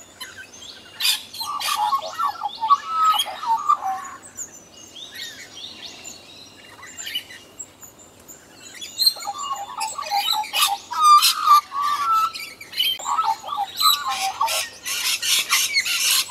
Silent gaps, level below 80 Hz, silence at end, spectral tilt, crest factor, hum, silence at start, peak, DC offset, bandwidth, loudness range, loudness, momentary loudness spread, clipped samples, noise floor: none; -66 dBFS; 0 s; 2 dB/octave; 20 dB; none; 0 s; -2 dBFS; under 0.1%; 16 kHz; 16 LU; -20 LUFS; 21 LU; under 0.1%; -46 dBFS